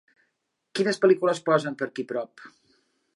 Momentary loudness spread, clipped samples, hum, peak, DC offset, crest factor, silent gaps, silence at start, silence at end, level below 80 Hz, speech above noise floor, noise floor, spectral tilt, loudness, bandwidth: 13 LU; under 0.1%; none; -8 dBFS; under 0.1%; 20 dB; none; 0.75 s; 0.65 s; -80 dBFS; 53 dB; -78 dBFS; -5.5 dB/octave; -25 LUFS; 11.5 kHz